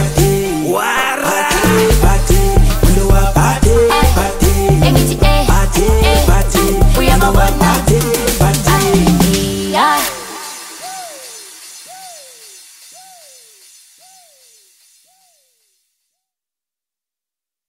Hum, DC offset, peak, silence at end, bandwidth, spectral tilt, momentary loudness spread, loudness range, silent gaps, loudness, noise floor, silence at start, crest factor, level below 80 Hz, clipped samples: none; under 0.1%; 0 dBFS; 5.5 s; 16.5 kHz; -5 dB/octave; 17 LU; 16 LU; none; -12 LUFS; -89 dBFS; 0 s; 12 dB; -18 dBFS; under 0.1%